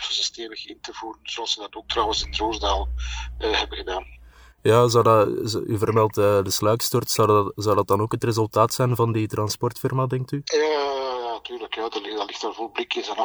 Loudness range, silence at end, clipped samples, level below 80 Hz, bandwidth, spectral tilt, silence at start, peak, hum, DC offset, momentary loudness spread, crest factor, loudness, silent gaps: 6 LU; 0 s; under 0.1%; -40 dBFS; over 20 kHz; -4.5 dB/octave; 0 s; -4 dBFS; none; under 0.1%; 12 LU; 20 dB; -23 LUFS; none